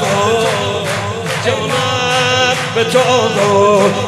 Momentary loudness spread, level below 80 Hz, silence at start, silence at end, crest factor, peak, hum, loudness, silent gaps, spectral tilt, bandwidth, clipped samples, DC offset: 7 LU; -52 dBFS; 0 s; 0 s; 14 dB; 0 dBFS; none; -13 LUFS; none; -4 dB/octave; 15 kHz; under 0.1%; under 0.1%